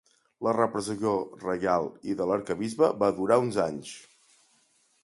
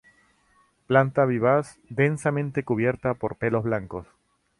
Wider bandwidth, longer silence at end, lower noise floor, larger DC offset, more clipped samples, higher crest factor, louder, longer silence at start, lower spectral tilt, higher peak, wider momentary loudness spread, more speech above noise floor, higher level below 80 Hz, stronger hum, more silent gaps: about the same, 11.5 kHz vs 11.5 kHz; first, 1.05 s vs 0.55 s; about the same, -67 dBFS vs -64 dBFS; neither; neither; about the same, 20 dB vs 20 dB; second, -27 LUFS vs -24 LUFS; second, 0.4 s vs 0.9 s; second, -6 dB/octave vs -7.5 dB/octave; second, -8 dBFS vs -4 dBFS; about the same, 9 LU vs 9 LU; about the same, 40 dB vs 40 dB; second, -64 dBFS vs -56 dBFS; neither; neither